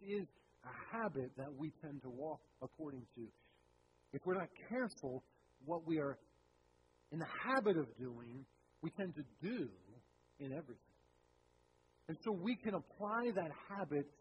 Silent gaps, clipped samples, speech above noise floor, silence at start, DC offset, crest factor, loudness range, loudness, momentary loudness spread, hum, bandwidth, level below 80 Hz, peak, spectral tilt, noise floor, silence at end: none; under 0.1%; 31 dB; 0 s; under 0.1%; 22 dB; 7 LU; -44 LUFS; 16 LU; 60 Hz at -80 dBFS; 10.5 kHz; -78 dBFS; -24 dBFS; -7.5 dB/octave; -74 dBFS; 0.1 s